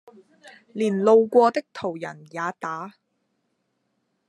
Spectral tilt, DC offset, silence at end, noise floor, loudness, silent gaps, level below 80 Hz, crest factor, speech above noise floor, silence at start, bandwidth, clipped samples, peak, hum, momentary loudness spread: -6.5 dB/octave; under 0.1%; 1.4 s; -74 dBFS; -22 LUFS; none; -80 dBFS; 20 dB; 52 dB; 0.75 s; 10.5 kHz; under 0.1%; -6 dBFS; none; 18 LU